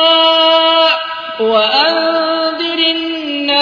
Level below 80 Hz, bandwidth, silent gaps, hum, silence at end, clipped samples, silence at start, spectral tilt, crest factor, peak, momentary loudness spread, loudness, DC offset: -56 dBFS; 5.4 kHz; none; none; 0 s; under 0.1%; 0 s; -3.5 dB/octave; 12 dB; 0 dBFS; 9 LU; -11 LUFS; under 0.1%